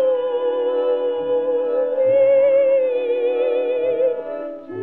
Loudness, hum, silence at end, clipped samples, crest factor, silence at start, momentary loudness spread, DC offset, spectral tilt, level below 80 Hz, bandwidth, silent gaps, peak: -19 LUFS; none; 0 s; under 0.1%; 10 dB; 0 s; 7 LU; 0.2%; -8 dB/octave; -66 dBFS; 3.8 kHz; none; -8 dBFS